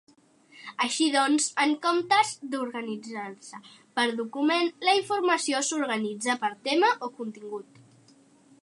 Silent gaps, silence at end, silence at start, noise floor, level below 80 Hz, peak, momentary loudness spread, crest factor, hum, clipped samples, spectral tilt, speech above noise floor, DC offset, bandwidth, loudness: none; 1 s; 0.55 s; -58 dBFS; -84 dBFS; -8 dBFS; 16 LU; 18 dB; none; under 0.1%; -2 dB/octave; 32 dB; under 0.1%; 11.5 kHz; -26 LUFS